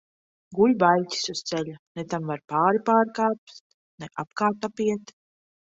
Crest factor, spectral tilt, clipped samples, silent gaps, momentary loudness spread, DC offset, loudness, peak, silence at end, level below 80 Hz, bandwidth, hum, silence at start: 20 dB; -5 dB/octave; under 0.1%; 1.79-1.95 s, 3.38-3.47 s, 3.60-3.98 s; 15 LU; under 0.1%; -24 LUFS; -6 dBFS; 0.65 s; -68 dBFS; 8 kHz; none; 0.5 s